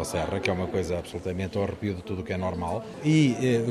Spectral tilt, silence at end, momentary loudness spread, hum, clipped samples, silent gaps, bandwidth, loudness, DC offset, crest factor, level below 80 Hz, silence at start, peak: -6.5 dB/octave; 0 s; 10 LU; none; under 0.1%; none; 13 kHz; -28 LUFS; under 0.1%; 18 dB; -50 dBFS; 0 s; -10 dBFS